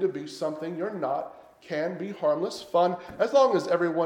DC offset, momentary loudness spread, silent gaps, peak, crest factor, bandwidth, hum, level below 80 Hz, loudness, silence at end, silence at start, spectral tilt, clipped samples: under 0.1%; 11 LU; none; -10 dBFS; 16 dB; 12 kHz; none; -70 dBFS; -27 LUFS; 0 s; 0 s; -5.5 dB/octave; under 0.1%